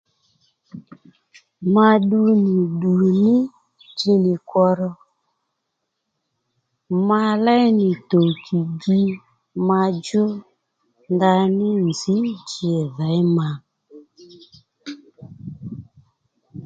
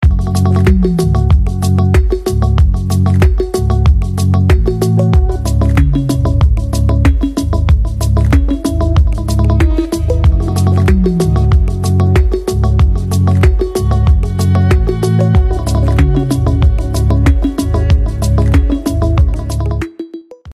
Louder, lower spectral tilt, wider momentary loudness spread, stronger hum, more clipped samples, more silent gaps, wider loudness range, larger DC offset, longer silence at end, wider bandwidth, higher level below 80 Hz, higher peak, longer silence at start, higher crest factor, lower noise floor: second, -19 LUFS vs -12 LUFS; about the same, -7.5 dB/octave vs -7.5 dB/octave; first, 19 LU vs 4 LU; neither; neither; neither; first, 7 LU vs 1 LU; neither; about the same, 0 s vs 0 s; second, 7.8 kHz vs 13.5 kHz; second, -62 dBFS vs -14 dBFS; about the same, 0 dBFS vs 0 dBFS; first, 0.75 s vs 0 s; first, 20 dB vs 10 dB; first, -77 dBFS vs -31 dBFS